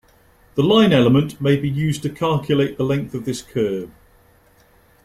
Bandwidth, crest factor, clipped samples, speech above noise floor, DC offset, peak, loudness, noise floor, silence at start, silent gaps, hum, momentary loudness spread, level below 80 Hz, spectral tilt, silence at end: 15 kHz; 18 dB; under 0.1%; 36 dB; under 0.1%; -2 dBFS; -19 LUFS; -54 dBFS; 0.55 s; none; none; 13 LU; -50 dBFS; -6.5 dB/octave; 1.2 s